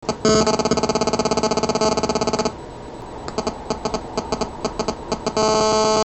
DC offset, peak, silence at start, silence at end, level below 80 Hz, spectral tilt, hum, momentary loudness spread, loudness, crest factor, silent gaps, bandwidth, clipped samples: under 0.1%; -4 dBFS; 0 s; 0 s; -40 dBFS; -4 dB/octave; none; 11 LU; -21 LUFS; 18 dB; none; 8.6 kHz; under 0.1%